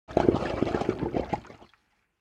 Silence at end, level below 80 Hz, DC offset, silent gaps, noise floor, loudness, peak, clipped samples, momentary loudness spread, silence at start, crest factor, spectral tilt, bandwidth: 0.65 s; -46 dBFS; under 0.1%; none; -68 dBFS; -29 LUFS; -4 dBFS; under 0.1%; 9 LU; 0.1 s; 26 dB; -7.5 dB/octave; 9.6 kHz